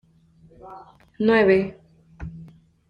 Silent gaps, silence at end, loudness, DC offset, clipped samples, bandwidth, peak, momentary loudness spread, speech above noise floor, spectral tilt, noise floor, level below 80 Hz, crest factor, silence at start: none; 0.45 s; -20 LUFS; under 0.1%; under 0.1%; 5.2 kHz; -6 dBFS; 26 LU; 34 dB; -8 dB/octave; -55 dBFS; -50 dBFS; 20 dB; 0.65 s